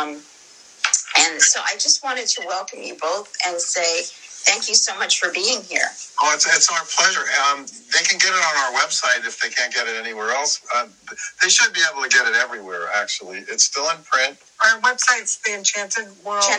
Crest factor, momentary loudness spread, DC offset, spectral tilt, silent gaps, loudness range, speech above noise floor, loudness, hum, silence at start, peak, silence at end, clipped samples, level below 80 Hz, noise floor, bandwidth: 20 dB; 11 LU; under 0.1%; 2 dB/octave; none; 3 LU; 26 dB; -18 LUFS; none; 0 s; 0 dBFS; 0 s; under 0.1%; -78 dBFS; -46 dBFS; 13.5 kHz